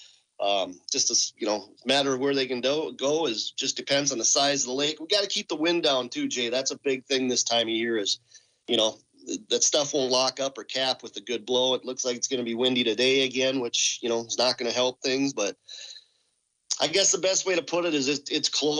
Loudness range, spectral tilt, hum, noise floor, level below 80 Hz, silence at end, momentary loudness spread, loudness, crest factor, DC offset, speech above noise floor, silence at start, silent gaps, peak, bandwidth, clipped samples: 2 LU; -1.5 dB/octave; none; -73 dBFS; -78 dBFS; 0 s; 8 LU; -25 LUFS; 16 dB; under 0.1%; 47 dB; 0 s; none; -10 dBFS; 10 kHz; under 0.1%